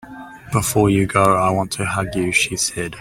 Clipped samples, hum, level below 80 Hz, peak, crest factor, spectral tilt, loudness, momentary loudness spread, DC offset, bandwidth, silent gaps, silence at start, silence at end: under 0.1%; none; -44 dBFS; -2 dBFS; 18 dB; -4.5 dB/octave; -18 LUFS; 7 LU; under 0.1%; 16.5 kHz; none; 0.05 s; 0 s